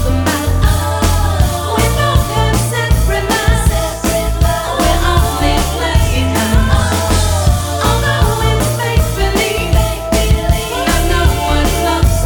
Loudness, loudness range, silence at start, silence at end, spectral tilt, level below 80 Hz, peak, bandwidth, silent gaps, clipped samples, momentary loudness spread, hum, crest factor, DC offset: -14 LUFS; 1 LU; 0 s; 0 s; -4.5 dB/octave; -16 dBFS; 0 dBFS; 19.5 kHz; none; under 0.1%; 2 LU; none; 12 dB; under 0.1%